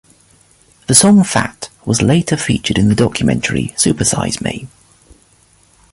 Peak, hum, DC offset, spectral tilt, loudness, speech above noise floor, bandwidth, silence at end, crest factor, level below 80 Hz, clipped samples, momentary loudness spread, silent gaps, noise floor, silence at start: 0 dBFS; none; under 0.1%; -4 dB/octave; -13 LUFS; 38 dB; 16 kHz; 1.25 s; 16 dB; -38 dBFS; under 0.1%; 13 LU; none; -51 dBFS; 0.9 s